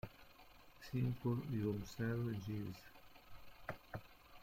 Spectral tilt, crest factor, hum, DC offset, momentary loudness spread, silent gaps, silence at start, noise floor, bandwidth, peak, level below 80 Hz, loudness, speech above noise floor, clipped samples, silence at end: -7.5 dB/octave; 16 dB; none; under 0.1%; 22 LU; none; 0.05 s; -62 dBFS; 16.5 kHz; -28 dBFS; -66 dBFS; -44 LUFS; 21 dB; under 0.1%; 0 s